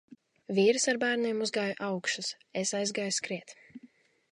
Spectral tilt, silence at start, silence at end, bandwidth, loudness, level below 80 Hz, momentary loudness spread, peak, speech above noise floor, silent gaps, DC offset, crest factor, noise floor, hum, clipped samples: -3 dB/octave; 0.5 s; 0.45 s; 11.5 kHz; -30 LUFS; -84 dBFS; 12 LU; -14 dBFS; 30 dB; none; under 0.1%; 18 dB; -60 dBFS; none; under 0.1%